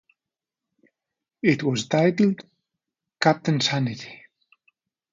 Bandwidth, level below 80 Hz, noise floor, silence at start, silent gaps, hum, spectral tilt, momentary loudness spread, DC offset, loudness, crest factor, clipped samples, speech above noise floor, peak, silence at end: 9 kHz; -68 dBFS; -89 dBFS; 1.45 s; none; none; -5.5 dB/octave; 12 LU; under 0.1%; -23 LUFS; 22 dB; under 0.1%; 67 dB; -4 dBFS; 1 s